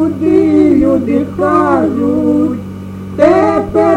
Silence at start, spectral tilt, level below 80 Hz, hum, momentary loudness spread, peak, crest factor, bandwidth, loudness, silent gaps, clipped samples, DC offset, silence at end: 0 s; -8.5 dB/octave; -38 dBFS; none; 11 LU; 0 dBFS; 10 dB; 9.4 kHz; -11 LUFS; none; under 0.1%; under 0.1%; 0 s